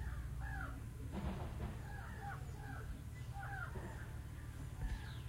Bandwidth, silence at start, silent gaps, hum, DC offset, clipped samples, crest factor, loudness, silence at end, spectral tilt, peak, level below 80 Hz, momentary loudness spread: 16 kHz; 0 s; none; none; under 0.1%; under 0.1%; 14 dB; -48 LUFS; 0 s; -6 dB/octave; -30 dBFS; -50 dBFS; 4 LU